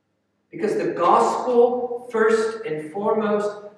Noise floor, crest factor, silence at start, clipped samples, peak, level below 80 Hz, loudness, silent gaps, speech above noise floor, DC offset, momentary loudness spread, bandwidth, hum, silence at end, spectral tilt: -71 dBFS; 18 dB; 0.55 s; under 0.1%; -2 dBFS; -76 dBFS; -21 LUFS; none; 50 dB; under 0.1%; 10 LU; 11 kHz; none; 0.1 s; -5.5 dB/octave